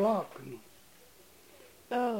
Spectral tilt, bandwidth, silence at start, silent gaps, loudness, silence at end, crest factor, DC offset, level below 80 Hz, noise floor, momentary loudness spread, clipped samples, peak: -6 dB/octave; 16.5 kHz; 0 s; none; -35 LUFS; 0 s; 16 dB; under 0.1%; -74 dBFS; -59 dBFS; 24 LU; under 0.1%; -18 dBFS